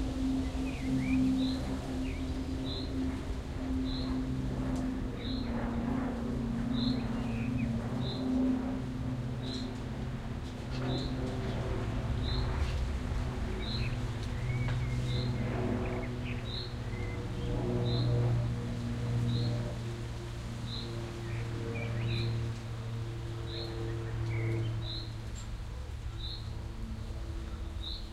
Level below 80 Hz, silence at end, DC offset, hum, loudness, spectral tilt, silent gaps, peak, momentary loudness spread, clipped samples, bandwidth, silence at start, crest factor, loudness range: -42 dBFS; 0 s; under 0.1%; none; -35 LUFS; -7 dB/octave; none; -18 dBFS; 8 LU; under 0.1%; 12 kHz; 0 s; 14 dB; 4 LU